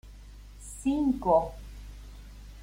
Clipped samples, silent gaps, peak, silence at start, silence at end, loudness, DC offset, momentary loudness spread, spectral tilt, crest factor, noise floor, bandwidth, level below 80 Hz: under 0.1%; none; -12 dBFS; 0.05 s; 0 s; -28 LUFS; under 0.1%; 24 LU; -6.5 dB/octave; 20 dB; -47 dBFS; 16.5 kHz; -46 dBFS